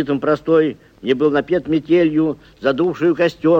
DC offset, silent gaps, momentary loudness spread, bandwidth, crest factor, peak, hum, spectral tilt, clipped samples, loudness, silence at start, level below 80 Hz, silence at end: under 0.1%; none; 7 LU; 7.4 kHz; 12 dB; -4 dBFS; none; -7.5 dB/octave; under 0.1%; -17 LUFS; 0 s; -52 dBFS; 0 s